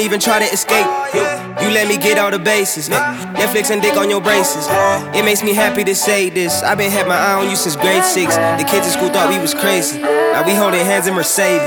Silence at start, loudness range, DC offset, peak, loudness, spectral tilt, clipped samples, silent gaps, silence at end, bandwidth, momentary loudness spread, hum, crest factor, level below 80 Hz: 0 s; 1 LU; under 0.1%; 0 dBFS; -14 LUFS; -2.5 dB/octave; under 0.1%; none; 0 s; 19.5 kHz; 3 LU; none; 14 dB; -56 dBFS